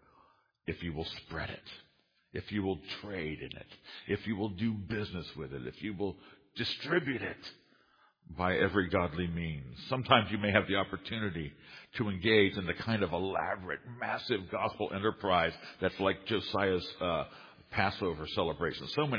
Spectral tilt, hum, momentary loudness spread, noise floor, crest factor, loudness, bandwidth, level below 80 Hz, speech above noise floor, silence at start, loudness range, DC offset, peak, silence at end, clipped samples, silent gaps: -3.5 dB/octave; none; 15 LU; -68 dBFS; 28 dB; -34 LUFS; 5.2 kHz; -58 dBFS; 34 dB; 0.65 s; 8 LU; under 0.1%; -8 dBFS; 0 s; under 0.1%; none